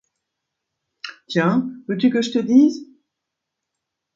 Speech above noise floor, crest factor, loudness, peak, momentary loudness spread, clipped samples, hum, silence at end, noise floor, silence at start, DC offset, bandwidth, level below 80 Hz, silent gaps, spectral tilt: 64 dB; 18 dB; -19 LUFS; -4 dBFS; 20 LU; under 0.1%; none; 1.3 s; -81 dBFS; 1.05 s; under 0.1%; 7.6 kHz; -70 dBFS; none; -6 dB/octave